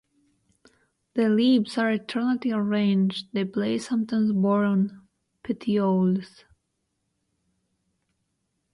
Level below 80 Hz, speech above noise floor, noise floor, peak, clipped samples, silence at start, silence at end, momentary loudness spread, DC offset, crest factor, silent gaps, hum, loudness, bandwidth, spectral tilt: -68 dBFS; 54 dB; -77 dBFS; -12 dBFS; under 0.1%; 1.15 s; 2.45 s; 9 LU; under 0.1%; 14 dB; none; none; -24 LUFS; 11 kHz; -7 dB/octave